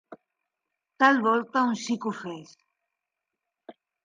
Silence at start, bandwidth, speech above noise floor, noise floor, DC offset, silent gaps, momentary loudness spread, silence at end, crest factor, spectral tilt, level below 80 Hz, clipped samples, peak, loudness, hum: 0.1 s; 9.6 kHz; 61 dB; -86 dBFS; under 0.1%; none; 17 LU; 0.35 s; 22 dB; -4.5 dB/octave; -82 dBFS; under 0.1%; -8 dBFS; -24 LUFS; none